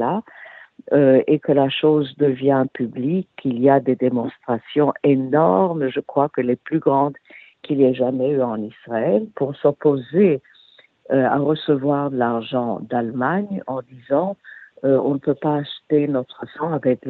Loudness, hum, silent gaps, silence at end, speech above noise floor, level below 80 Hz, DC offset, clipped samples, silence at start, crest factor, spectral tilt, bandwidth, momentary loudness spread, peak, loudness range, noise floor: -20 LUFS; none; none; 0 s; 34 dB; -66 dBFS; under 0.1%; under 0.1%; 0 s; 16 dB; -10.5 dB/octave; 4.3 kHz; 9 LU; -4 dBFS; 3 LU; -53 dBFS